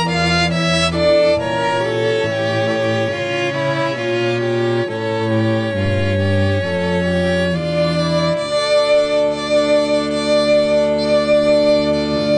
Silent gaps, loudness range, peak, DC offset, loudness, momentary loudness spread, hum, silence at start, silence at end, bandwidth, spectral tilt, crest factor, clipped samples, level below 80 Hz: none; 3 LU; -4 dBFS; under 0.1%; -16 LUFS; 5 LU; none; 0 s; 0 s; 10 kHz; -5.5 dB/octave; 12 dB; under 0.1%; -42 dBFS